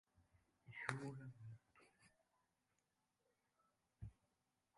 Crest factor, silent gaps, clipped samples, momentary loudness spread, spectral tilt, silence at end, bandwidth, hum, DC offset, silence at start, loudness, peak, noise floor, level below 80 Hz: 36 dB; none; under 0.1%; 14 LU; -5.5 dB/octave; 0.65 s; 11 kHz; none; under 0.1%; 0.15 s; -53 LUFS; -22 dBFS; -88 dBFS; -76 dBFS